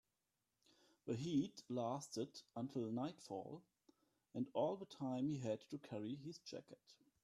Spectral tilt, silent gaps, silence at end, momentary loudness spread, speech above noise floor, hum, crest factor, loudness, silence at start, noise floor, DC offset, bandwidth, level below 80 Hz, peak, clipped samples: -6.5 dB/octave; none; 0.3 s; 13 LU; 44 dB; none; 18 dB; -46 LUFS; 1.05 s; -90 dBFS; under 0.1%; 13 kHz; -84 dBFS; -28 dBFS; under 0.1%